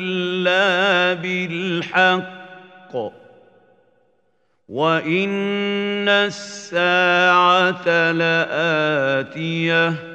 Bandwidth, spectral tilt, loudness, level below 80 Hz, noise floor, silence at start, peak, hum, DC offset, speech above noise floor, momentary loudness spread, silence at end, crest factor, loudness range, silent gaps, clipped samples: 8.8 kHz; -5 dB/octave; -18 LUFS; -72 dBFS; -67 dBFS; 0 s; -2 dBFS; none; under 0.1%; 48 dB; 14 LU; 0 s; 18 dB; 8 LU; none; under 0.1%